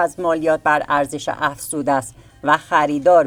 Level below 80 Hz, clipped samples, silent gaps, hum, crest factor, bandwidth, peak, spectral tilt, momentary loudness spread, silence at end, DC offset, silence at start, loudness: -52 dBFS; under 0.1%; none; none; 16 dB; 20 kHz; -2 dBFS; -4.5 dB/octave; 8 LU; 0 s; under 0.1%; 0 s; -19 LUFS